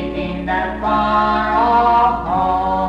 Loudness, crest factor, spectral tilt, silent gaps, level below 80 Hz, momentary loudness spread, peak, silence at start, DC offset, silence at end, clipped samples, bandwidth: -16 LUFS; 10 dB; -7 dB/octave; none; -34 dBFS; 7 LU; -6 dBFS; 0 s; under 0.1%; 0 s; under 0.1%; 8.2 kHz